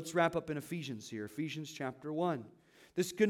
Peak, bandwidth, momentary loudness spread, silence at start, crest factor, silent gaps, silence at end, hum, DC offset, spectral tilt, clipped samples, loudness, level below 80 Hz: -16 dBFS; 17.5 kHz; 10 LU; 0 s; 20 dB; none; 0 s; none; under 0.1%; -5 dB/octave; under 0.1%; -38 LUFS; -74 dBFS